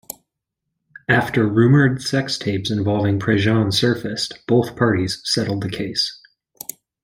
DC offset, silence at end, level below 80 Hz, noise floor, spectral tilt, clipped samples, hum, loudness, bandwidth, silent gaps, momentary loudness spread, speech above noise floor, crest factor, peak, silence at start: under 0.1%; 0.9 s; -52 dBFS; -80 dBFS; -5.5 dB/octave; under 0.1%; none; -19 LUFS; 16.5 kHz; none; 16 LU; 62 dB; 20 dB; 0 dBFS; 1.1 s